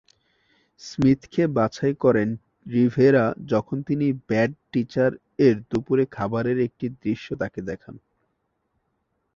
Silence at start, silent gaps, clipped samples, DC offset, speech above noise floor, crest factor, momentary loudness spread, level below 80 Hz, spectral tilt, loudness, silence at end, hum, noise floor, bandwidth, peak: 0.8 s; none; under 0.1%; under 0.1%; 52 dB; 18 dB; 10 LU; -56 dBFS; -8 dB/octave; -23 LUFS; 1.4 s; none; -74 dBFS; 7.4 kHz; -6 dBFS